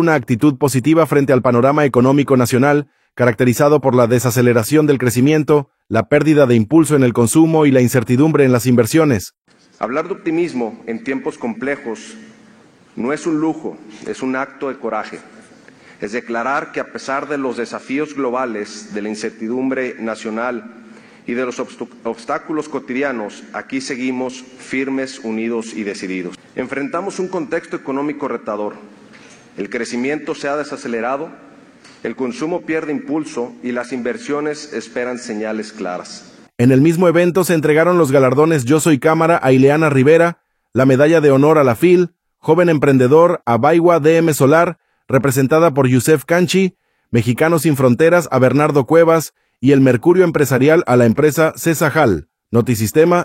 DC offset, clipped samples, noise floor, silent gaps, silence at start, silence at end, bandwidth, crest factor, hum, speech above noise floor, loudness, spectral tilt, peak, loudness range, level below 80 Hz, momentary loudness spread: under 0.1%; under 0.1%; -47 dBFS; 9.38-9.42 s; 0 s; 0 s; 16.5 kHz; 16 dB; none; 32 dB; -15 LUFS; -6.5 dB/octave; 0 dBFS; 11 LU; -54 dBFS; 14 LU